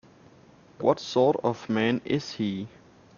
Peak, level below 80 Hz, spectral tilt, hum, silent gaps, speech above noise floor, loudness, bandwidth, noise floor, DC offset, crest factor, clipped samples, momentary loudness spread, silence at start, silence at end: -8 dBFS; -66 dBFS; -5 dB/octave; none; none; 29 dB; -27 LUFS; 7.2 kHz; -54 dBFS; under 0.1%; 20 dB; under 0.1%; 8 LU; 0.8 s; 0.5 s